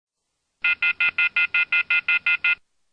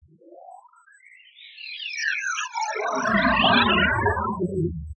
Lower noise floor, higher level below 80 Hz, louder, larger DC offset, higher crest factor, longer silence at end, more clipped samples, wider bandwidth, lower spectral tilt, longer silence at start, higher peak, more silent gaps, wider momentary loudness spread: first, -77 dBFS vs -53 dBFS; second, -68 dBFS vs -44 dBFS; about the same, -20 LUFS vs -22 LUFS; neither; about the same, 14 dB vs 18 dB; first, 0.4 s vs 0.05 s; neither; second, 5.8 kHz vs 8.4 kHz; second, -2 dB/octave vs -4 dB/octave; first, 0.65 s vs 0.3 s; second, -10 dBFS vs -6 dBFS; neither; second, 4 LU vs 13 LU